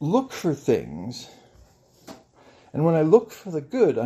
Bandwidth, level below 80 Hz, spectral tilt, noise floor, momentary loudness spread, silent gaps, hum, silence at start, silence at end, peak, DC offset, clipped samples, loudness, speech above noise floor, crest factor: 15 kHz; -62 dBFS; -7.5 dB/octave; -55 dBFS; 17 LU; none; none; 0 s; 0 s; -2 dBFS; under 0.1%; under 0.1%; -23 LUFS; 33 dB; 22 dB